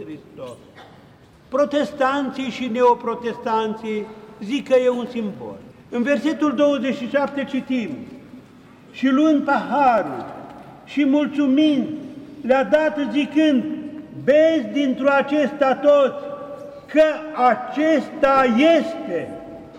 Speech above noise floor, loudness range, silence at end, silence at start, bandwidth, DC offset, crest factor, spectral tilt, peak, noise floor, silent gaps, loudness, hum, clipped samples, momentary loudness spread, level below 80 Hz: 28 dB; 4 LU; 0 s; 0 s; 9.8 kHz; under 0.1%; 14 dB; -5.5 dB/octave; -6 dBFS; -47 dBFS; none; -19 LUFS; none; under 0.1%; 19 LU; -60 dBFS